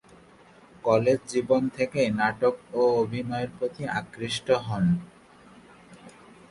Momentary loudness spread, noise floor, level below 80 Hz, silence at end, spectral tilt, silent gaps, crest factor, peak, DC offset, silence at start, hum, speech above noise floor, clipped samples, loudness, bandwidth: 8 LU; -53 dBFS; -58 dBFS; 0.4 s; -6 dB/octave; none; 20 dB; -8 dBFS; under 0.1%; 0.85 s; none; 28 dB; under 0.1%; -26 LUFS; 11.5 kHz